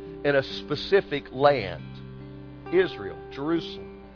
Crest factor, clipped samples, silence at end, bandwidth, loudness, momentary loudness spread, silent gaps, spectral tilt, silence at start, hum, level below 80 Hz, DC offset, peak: 22 dB; under 0.1%; 0 s; 5.4 kHz; -26 LUFS; 19 LU; none; -7 dB/octave; 0 s; none; -52 dBFS; under 0.1%; -4 dBFS